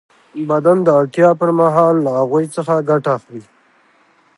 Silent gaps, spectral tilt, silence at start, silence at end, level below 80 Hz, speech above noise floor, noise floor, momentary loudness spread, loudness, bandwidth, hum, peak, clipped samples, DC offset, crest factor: none; -8 dB/octave; 0.35 s; 0.95 s; -68 dBFS; 40 dB; -54 dBFS; 13 LU; -14 LUFS; 11.5 kHz; none; 0 dBFS; under 0.1%; under 0.1%; 14 dB